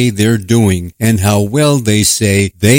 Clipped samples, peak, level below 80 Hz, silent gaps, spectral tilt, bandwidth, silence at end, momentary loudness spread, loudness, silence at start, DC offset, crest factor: 0.3%; 0 dBFS; -38 dBFS; none; -5 dB/octave; 17 kHz; 0 s; 4 LU; -11 LUFS; 0 s; under 0.1%; 10 dB